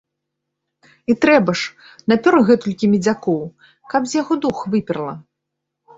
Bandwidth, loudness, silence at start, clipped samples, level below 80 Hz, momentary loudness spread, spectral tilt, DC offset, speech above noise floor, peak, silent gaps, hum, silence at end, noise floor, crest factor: 8 kHz; -18 LUFS; 1.1 s; under 0.1%; -58 dBFS; 14 LU; -6 dB/octave; under 0.1%; 62 dB; -2 dBFS; none; none; 0.75 s; -79 dBFS; 18 dB